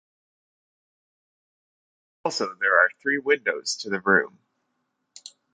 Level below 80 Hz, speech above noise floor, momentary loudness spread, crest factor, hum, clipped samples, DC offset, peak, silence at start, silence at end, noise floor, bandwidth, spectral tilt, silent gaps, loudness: -74 dBFS; 53 dB; 10 LU; 24 dB; none; under 0.1%; under 0.1%; -4 dBFS; 2.25 s; 1.25 s; -76 dBFS; 9.6 kHz; -3 dB/octave; none; -23 LUFS